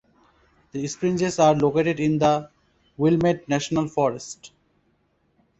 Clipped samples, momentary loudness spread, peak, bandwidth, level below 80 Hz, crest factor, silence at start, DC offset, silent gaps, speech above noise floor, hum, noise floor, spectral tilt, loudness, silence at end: under 0.1%; 14 LU; -6 dBFS; 8.2 kHz; -56 dBFS; 18 dB; 0.75 s; under 0.1%; none; 45 dB; none; -67 dBFS; -6 dB/octave; -22 LUFS; 1.15 s